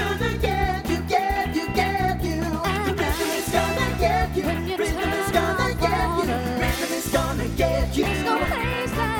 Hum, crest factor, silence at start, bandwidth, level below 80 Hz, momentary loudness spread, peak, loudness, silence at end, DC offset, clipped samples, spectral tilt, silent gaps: none; 16 dB; 0 s; 18.5 kHz; -32 dBFS; 3 LU; -8 dBFS; -23 LUFS; 0 s; under 0.1%; under 0.1%; -5 dB/octave; none